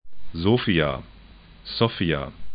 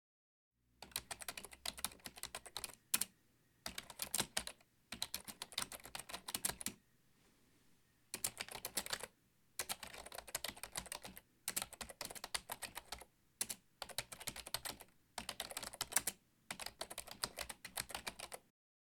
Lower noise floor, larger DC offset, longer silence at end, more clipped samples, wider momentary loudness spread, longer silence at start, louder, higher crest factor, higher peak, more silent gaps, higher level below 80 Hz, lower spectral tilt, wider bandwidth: second, -47 dBFS vs -75 dBFS; neither; second, 0 s vs 0.45 s; neither; first, 15 LU vs 12 LU; second, 0.05 s vs 0.8 s; first, -24 LUFS vs -45 LUFS; second, 20 dB vs 34 dB; first, -4 dBFS vs -14 dBFS; neither; first, -44 dBFS vs -70 dBFS; first, -11 dB/octave vs -0.5 dB/octave; second, 5.2 kHz vs 19 kHz